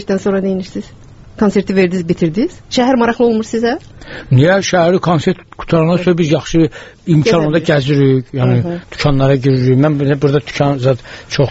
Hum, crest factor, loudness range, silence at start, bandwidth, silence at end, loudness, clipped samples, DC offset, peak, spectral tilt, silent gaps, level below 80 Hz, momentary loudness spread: none; 12 dB; 2 LU; 0 s; 8 kHz; 0 s; -13 LUFS; under 0.1%; under 0.1%; 0 dBFS; -7 dB/octave; none; -36 dBFS; 8 LU